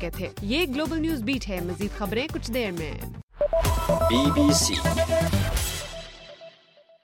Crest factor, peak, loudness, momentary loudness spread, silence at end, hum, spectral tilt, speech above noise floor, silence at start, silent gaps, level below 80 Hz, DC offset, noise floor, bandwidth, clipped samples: 18 dB; -8 dBFS; -25 LUFS; 16 LU; 0.55 s; none; -4.5 dB/octave; 32 dB; 0 s; 3.23-3.28 s; -36 dBFS; under 0.1%; -56 dBFS; 17 kHz; under 0.1%